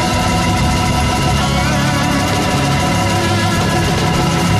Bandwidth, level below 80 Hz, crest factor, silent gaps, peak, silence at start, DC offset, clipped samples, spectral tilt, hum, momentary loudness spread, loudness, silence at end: 15 kHz; -26 dBFS; 10 dB; none; -4 dBFS; 0 s; under 0.1%; under 0.1%; -4.5 dB/octave; none; 0 LU; -14 LUFS; 0 s